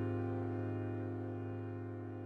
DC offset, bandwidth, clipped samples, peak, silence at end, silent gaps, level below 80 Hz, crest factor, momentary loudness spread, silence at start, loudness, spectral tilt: under 0.1%; 4.1 kHz; under 0.1%; -28 dBFS; 0 s; none; -70 dBFS; 12 dB; 5 LU; 0 s; -41 LUFS; -10.5 dB/octave